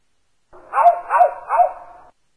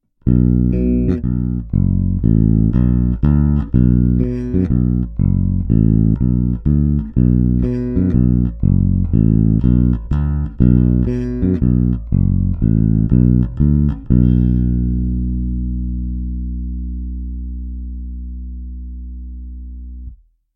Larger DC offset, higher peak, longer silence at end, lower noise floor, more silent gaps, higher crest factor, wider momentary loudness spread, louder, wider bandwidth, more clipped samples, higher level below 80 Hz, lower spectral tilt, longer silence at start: neither; about the same, -2 dBFS vs 0 dBFS; first, 0.55 s vs 0.4 s; first, -69 dBFS vs -37 dBFS; neither; about the same, 16 dB vs 14 dB; second, 8 LU vs 16 LU; about the same, -17 LUFS vs -16 LUFS; first, 11 kHz vs 3.3 kHz; neither; second, -58 dBFS vs -20 dBFS; second, -3.5 dB/octave vs -13 dB/octave; first, 0.75 s vs 0.25 s